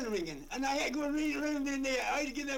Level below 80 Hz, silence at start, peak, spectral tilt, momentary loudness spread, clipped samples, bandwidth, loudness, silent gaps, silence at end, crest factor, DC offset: -54 dBFS; 0 s; -22 dBFS; -3 dB/octave; 4 LU; under 0.1%; 17 kHz; -34 LUFS; none; 0 s; 12 dB; under 0.1%